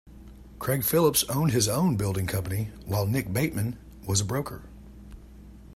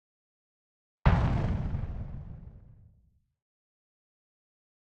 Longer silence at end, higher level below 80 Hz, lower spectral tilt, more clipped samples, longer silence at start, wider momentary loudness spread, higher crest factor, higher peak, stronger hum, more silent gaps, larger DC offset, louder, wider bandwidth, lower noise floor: second, 0 s vs 2.3 s; second, -48 dBFS vs -38 dBFS; second, -5 dB/octave vs -8.5 dB/octave; neither; second, 0.05 s vs 1.05 s; second, 12 LU vs 21 LU; second, 18 dB vs 26 dB; about the same, -10 dBFS vs -8 dBFS; neither; neither; neither; first, -26 LUFS vs -31 LUFS; first, 16 kHz vs 7.2 kHz; second, -47 dBFS vs -67 dBFS